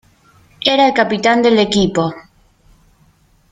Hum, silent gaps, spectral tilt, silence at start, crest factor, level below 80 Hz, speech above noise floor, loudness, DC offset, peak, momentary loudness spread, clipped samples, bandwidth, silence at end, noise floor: none; none; -4.5 dB/octave; 0.6 s; 16 dB; -46 dBFS; 40 dB; -14 LUFS; under 0.1%; 0 dBFS; 7 LU; under 0.1%; 9.4 kHz; 1.3 s; -53 dBFS